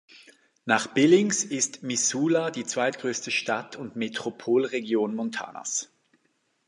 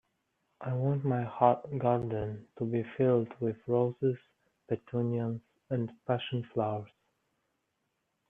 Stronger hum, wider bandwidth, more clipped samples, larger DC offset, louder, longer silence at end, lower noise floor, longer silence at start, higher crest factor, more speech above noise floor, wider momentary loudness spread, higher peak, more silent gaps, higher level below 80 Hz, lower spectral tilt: neither; first, 11.5 kHz vs 3.8 kHz; neither; neither; first, -26 LUFS vs -32 LUFS; second, 0.85 s vs 1.45 s; second, -72 dBFS vs -81 dBFS; second, 0.15 s vs 0.6 s; about the same, 20 dB vs 22 dB; second, 46 dB vs 50 dB; about the same, 12 LU vs 11 LU; first, -6 dBFS vs -10 dBFS; neither; second, -76 dBFS vs -66 dBFS; second, -3 dB/octave vs -10.5 dB/octave